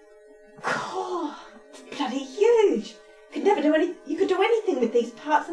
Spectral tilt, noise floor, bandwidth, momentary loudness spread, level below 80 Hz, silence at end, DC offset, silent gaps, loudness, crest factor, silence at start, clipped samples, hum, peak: -4.5 dB/octave; -51 dBFS; 11 kHz; 13 LU; -68 dBFS; 0 s; under 0.1%; none; -24 LUFS; 16 dB; 0.6 s; under 0.1%; none; -8 dBFS